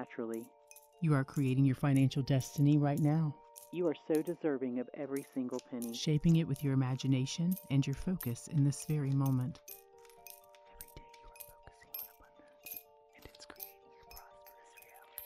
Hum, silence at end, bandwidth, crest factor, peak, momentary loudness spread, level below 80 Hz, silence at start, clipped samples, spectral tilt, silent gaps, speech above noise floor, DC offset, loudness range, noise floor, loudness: none; 0 s; 16 kHz; 16 dB; -18 dBFS; 23 LU; -62 dBFS; 0 s; under 0.1%; -7 dB/octave; none; 29 dB; under 0.1%; 18 LU; -61 dBFS; -34 LUFS